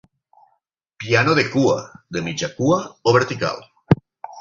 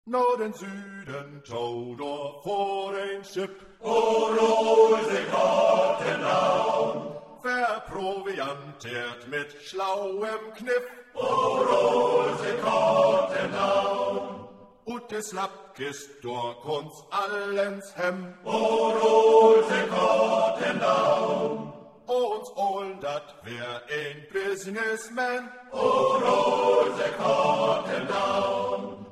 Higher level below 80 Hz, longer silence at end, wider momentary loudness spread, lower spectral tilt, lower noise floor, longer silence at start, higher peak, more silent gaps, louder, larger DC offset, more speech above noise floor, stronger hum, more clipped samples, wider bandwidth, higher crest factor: first, -50 dBFS vs -68 dBFS; about the same, 0 s vs 0 s; second, 12 LU vs 15 LU; about the same, -5.5 dB/octave vs -4.5 dB/octave; first, -69 dBFS vs -46 dBFS; first, 1 s vs 0.05 s; first, -2 dBFS vs -6 dBFS; neither; first, -20 LUFS vs -25 LUFS; neither; first, 50 dB vs 21 dB; neither; neither; second, 7.6 kHz vs 13 kHz; about the same, 20 dB vs 18 dB